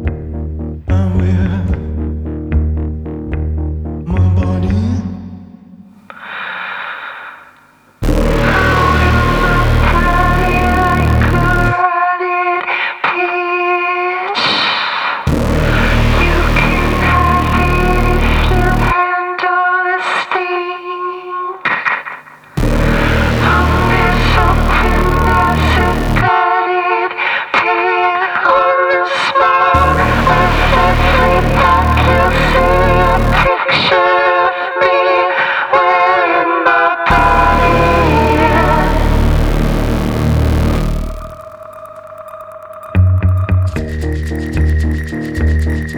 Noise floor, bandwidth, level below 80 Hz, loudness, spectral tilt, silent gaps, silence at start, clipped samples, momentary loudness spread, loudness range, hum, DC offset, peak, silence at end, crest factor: -46 dBFS; 19.5 kHz; -20 dBFS; -13 LUFS; -6.5 dB/octave; none; 0 s; under 0.1%; 11 LU; 7 LU; none; under 0.1%; 0 dBFS; 0 s; 12 dB